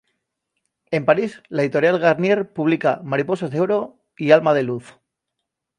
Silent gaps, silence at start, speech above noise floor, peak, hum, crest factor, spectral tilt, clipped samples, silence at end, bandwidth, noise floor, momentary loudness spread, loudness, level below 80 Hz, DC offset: none; 0.9 s; 62 dB; 0 dBFS; none; 20 dB; -7 dB/octave; under 0.1%; 0.95 s; 10 kHz; -80 dBFS; 10 LU; -19 LUFS; -68 dBFS; under 0.1%